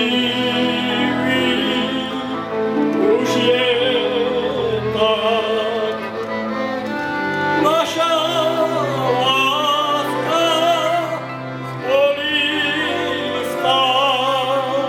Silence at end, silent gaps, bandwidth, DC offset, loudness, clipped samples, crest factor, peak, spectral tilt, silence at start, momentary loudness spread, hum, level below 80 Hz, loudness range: 0 s; none; 16.5 kHz; under 0.1%; -18 LUFS; under 0.1%; 14 dB; -4 dBFS; -4 dB/octave; 0 s; 7 LU; none; -58 dBFS; 2 LU